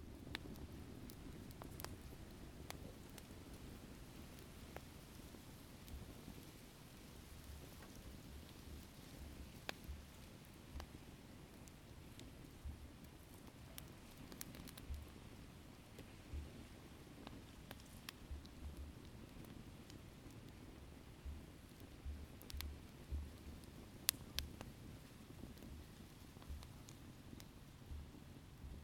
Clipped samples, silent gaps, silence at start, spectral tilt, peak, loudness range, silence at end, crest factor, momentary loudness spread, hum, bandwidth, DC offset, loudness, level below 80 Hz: under 0.1%; none; 0 s; -4 dB/octave; -8 dBFS; 9 LU; 0 s; 46 dB; 8 LU; none; 19 kHz; under 0.1%; -55 LUFS; -58 dBFS